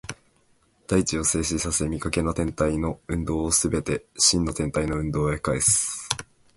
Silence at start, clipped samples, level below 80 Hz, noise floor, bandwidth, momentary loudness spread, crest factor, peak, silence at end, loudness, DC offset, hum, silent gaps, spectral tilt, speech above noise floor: 0.05 s; under 0.1%; -40 dBFS; -63 dBFS; 12 kHz; 9 LU; 26 dB; 0 dBFS; 0.35 s; -24 LUFS; under 0.1%; none; none; -3.5 dB/octave; 39 dB